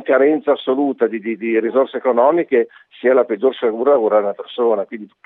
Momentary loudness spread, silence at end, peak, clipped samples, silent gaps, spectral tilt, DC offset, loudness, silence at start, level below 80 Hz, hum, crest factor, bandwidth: 7 LU; 0.2 s; -2 dBFS; under 0.1%; none; -8.5 dB/octave; under 0.1%; -17 LUFS; 0 s; -86 dBFS; none; 16 dB; 4 kHz